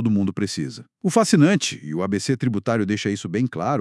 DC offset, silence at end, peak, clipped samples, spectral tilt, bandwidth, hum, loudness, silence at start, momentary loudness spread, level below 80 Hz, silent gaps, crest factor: under 0.1%; 0 s; -2 dBFS; under 0.1%; -5.5 dB/octave; 12 kHz; none; -21 LUFS; 0 s; 10 LU; -68 dBFS; none; 18 dB